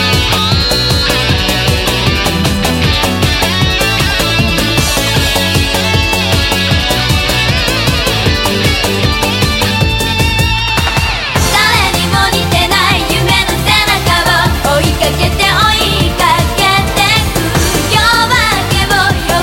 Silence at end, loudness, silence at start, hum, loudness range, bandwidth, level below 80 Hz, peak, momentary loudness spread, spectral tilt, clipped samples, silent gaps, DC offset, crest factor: 0 s; -10 LUFS; 0 s; none; 1 LU; 17 kHz; -20 dBFS; 0 dBFS; 3 LU; -3.5 dB/octave; under 0.1%; none; under 0.1%; 10 dB